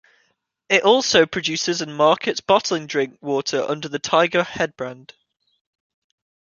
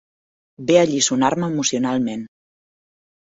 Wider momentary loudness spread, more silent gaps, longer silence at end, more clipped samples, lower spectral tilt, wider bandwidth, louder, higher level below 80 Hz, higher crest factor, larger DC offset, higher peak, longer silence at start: about the same, 10 LU vs 11 LU; neither; first, 1.5 s vs 0.95 s; neither; about the same, -3 dB/octave vs -4 dB/octave; about the same, 7.4 kHz vs 8 kHz; about the same, -19 LUFS vs -19 LUFS; about the same, -62 dBFS vs -60 dBFS; about the same, 20 dB vs 20 dB; neither; about the same, -2 dBFS vs -2 dBFS; about the same, 0.7 s vs 0.6 s